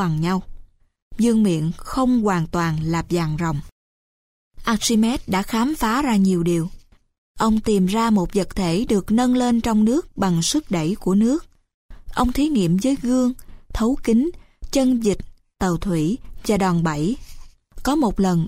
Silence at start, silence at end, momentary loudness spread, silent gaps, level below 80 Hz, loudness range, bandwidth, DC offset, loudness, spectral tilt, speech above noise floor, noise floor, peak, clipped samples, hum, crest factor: 0 s; 0 s; 7 LU; 1.02-1.11 s, 3.72-4.51 s, 7.18-7.35 s, 11.74-11.89 s; -38 dBFS; 3 LU; 16 kHz; under 0.1%; -20 LUFS; -6 dB/octave; 23 dB; -42 dBFS; -6 dBFS; under 0.1%; none; 14 dB